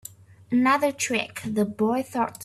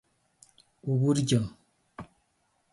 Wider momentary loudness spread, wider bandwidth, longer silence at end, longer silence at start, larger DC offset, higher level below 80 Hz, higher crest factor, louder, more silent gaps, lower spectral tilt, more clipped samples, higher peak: second, 7 LU vs 23 LU; first, 14.5 kHz vs 11.5 kHz; second, 0 s vs 0.7 s; second, 0.5 s vs 0.85 s; neither; about the same, -64 dBFS vs -60 dBFS; about the same, 16 dB vs 20 dB; first, -24 LUFS vs -28 LUFS; neither; second, -4 dB/octave vs -6.5 dB/octave; neither; about the same, -10 dBFS vs -12 dBFS